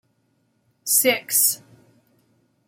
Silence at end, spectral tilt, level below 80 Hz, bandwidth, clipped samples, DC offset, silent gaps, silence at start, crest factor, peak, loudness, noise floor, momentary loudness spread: 1.1 s; 0 dB/octave; -78 dBFS; 16.5 kHz; under 0.1%; under 0.1%; none; 0.85 s; 22 dB; -4 dBFS; -18 LUFS; -67 dBFS; 15 LU